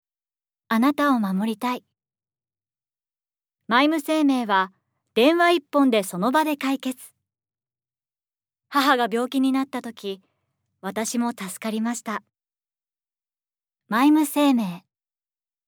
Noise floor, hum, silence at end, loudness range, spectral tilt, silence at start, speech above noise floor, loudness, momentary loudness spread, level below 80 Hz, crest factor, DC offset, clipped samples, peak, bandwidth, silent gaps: under -90 dBFS; none; 0.9 s; 9 LU; -4.5 dB/octave; 0.7 s; over 68 dB; -22 LUFS; 13 LU; -80 dBFS; 20 dB; under 0.1%; under 0.1%; -4 dBFS; over 20 kHz; none